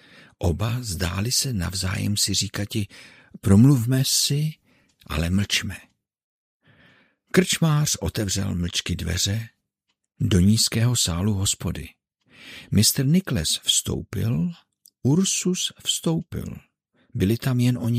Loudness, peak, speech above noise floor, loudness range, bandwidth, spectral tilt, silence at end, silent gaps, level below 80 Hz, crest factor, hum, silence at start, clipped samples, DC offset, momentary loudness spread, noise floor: -22 LUFS; -2 dBFS; 55 dB; 4 LU; 16 kHz; -4 dB/octave; 0 s; 6.24-6.60 s; -46 dBFS; 22 dB; none; 0.4 s; under 0.1%; under 0.1%; 13 LU; -77 dBFS